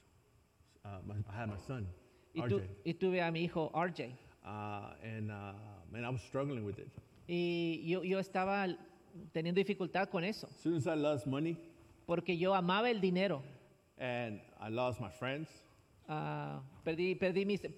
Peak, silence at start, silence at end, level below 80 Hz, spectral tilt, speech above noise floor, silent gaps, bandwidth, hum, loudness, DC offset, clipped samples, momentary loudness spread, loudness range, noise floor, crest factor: -22 dBFS; 0.85 s; 0 s; -72 dBFS; -7 dB/octave; 32 dB; none; 13 kHz; none; -38 LUFS; under 0.1%; under 0.1%; 15 LU; 6 LU; -69 dBFS; 18 dB